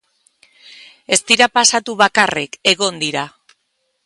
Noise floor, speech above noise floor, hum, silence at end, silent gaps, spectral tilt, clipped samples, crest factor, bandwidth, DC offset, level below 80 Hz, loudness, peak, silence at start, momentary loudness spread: -68 dBFS; 53 dB; none; 0.8 s; none; -1 dB/octave; under 0.1%; 18 dB; 16 kHz; under 0.1%; -62 dBFS; -14 LUFS; 0 dBFS; 1.1 s; 10 LU